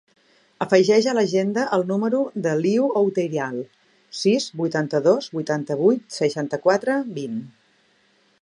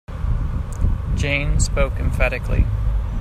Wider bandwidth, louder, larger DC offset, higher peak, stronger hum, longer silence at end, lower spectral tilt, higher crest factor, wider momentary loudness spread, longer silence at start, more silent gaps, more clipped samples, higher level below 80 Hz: about the same, 11 kHz vs 12 kHz; about the same, -21 LUFS vs -22 LUFS; neither; about the same, -2 dBFS vs -4 dBFS; neither; first, 0.95 s vs 0 s; about the same, -5.5 dB/octave vs -5.5 dB/octave; about the same, 20 dB vs 16 dB; first, 11 LU vs 5 LU; first, 0.6 s vs 0.1 s; neither; neither; second, -74 dBFS vs -22 dBFS